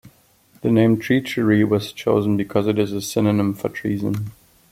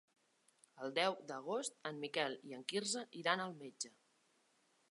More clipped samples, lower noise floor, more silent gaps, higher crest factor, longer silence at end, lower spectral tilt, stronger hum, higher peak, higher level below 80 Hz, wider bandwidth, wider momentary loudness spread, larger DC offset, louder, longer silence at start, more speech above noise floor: neither; second, -55 dBFS vs -77 dBFS; neither; second, 16 dB vs 26 dB; second, 0.4 s vs 1 s; first, -6.5 dB/octave vs -2.5 dB/octave; neither; first, -4 dBFS vs -18 dBFS; first, -56 dBFS vs under -90 dBFS; first, 16 kHz vs 11.5 kHz; about the same, 9 LU vs 10 LU; neither; first, -20 LUFS vs -41 LUFS; second, 0.05 s vs 0.75 s; about the same, 36 dB vs 35 dB